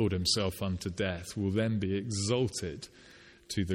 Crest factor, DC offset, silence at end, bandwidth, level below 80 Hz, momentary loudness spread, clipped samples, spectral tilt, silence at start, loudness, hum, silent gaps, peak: 18 dB; under 0.1%; 0 s; 16.5 kHz; -54 dBFS; 9 LU; under 0.1%; -5 dB/octave; 0 s; -32 LUFS; none; none; -16 dBFS